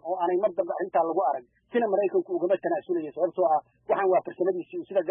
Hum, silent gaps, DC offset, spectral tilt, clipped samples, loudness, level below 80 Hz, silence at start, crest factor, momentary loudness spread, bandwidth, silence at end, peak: none; none; under 0.1%; -10.5 dB/octave; under 0.1%; -27 LUFS; -76 dBFS; 0.05 s; 14 dB; 5 LU; 3.6 kHz; 0 s; -12 dBFS